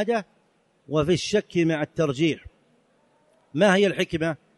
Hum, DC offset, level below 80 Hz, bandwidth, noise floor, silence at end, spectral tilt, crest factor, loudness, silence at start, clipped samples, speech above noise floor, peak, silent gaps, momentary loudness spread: none; under 0.1%; -54 dBFS; 11.5 kHz; -65 dBFS; 0.2 s; -5.5 dB/octave; 18 dB; -23 LUFS; 0 s; under 0.1%; 42 dB; -8 dBFS; none; 9 LU